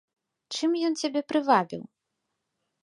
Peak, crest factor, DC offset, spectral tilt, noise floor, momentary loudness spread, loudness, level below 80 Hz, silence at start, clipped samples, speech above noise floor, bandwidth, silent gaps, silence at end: -8 dBFS; 22 dB; under 0.1%; -4 dB/octave; -81 dBFS; 13 LU; -26 LUFS; -80 dBFS; 0.5 s; under 0.1%; 56 dB; 11.5 kHz; none; 1 s